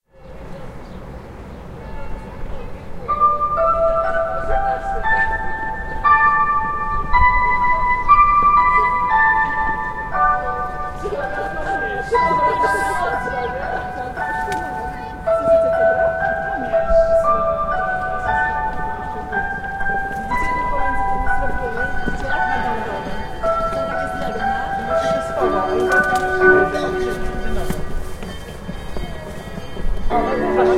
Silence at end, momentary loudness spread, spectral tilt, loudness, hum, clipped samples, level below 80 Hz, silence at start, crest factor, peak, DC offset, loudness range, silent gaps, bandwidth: 0 s; 17 LU; -6 dB/octave; -18 LUFS; none; under 0.1%; -30 dBFS; 0.2 s; 18 dB; 0 dBFS; under 0.1%; 7 LU; none; 14.5 kHz